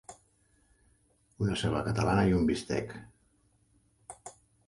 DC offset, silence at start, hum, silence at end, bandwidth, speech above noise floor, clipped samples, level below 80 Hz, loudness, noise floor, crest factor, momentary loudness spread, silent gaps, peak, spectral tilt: under 0.1%; 0.1 s; none; 0.35 s; 11.5 kHz; 40 dB; under 0.1%; -50 dBFS; -30 LUFS; -69 dBFS; 18 dB; 24 LU; none; -14 dBFS; -6.5 dB/octave